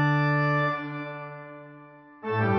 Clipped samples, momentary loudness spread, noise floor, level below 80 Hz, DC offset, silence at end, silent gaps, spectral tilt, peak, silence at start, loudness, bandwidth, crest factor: under 0.1%; 21 LU; -49 dBFS; -60 dBFS; under 0.1%; 0 s; none; -8.5 dB/octave; -12 dBFS; 0 s; -26 LUFS; 6.2 kHz; 14 dB